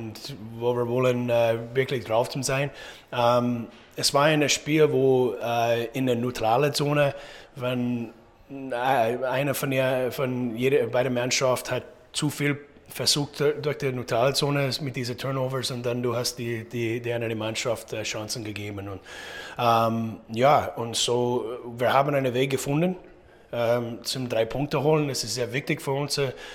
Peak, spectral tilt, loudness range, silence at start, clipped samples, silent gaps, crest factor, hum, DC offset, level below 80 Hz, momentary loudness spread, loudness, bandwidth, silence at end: -6 dBFS; -4.5 dB/octave; 5 LU; 0 s; under 0.1%; none; 20 dB; none; under 0.1%; -58 dBFS; 11 LU; -25 LUFS; 17 kHz; 0 s